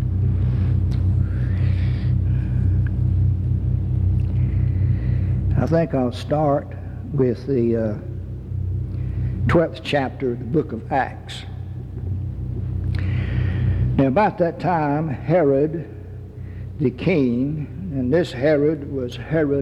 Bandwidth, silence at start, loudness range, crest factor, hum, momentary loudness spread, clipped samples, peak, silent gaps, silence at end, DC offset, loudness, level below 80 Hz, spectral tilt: 8 kHz; 0 s; 3 LU; 16 dB; none; 11 LU; under 0.1%; -4 dBFS; none; 0 s; under 0.1%; -21 LUFS; -32 dBFS; -9 dB/octave